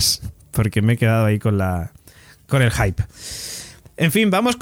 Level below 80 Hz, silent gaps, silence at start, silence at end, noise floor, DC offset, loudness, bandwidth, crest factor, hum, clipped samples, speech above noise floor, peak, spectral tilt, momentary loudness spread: -38 dBFS; none; 0 s; 0 s; -48 dBFS; under 0.1%; -19 LUFS; 17.5 kHz; 16 dB; none; under 0.1%; 29 dB; -2 dBFS; -5 dB/octave; 13 LU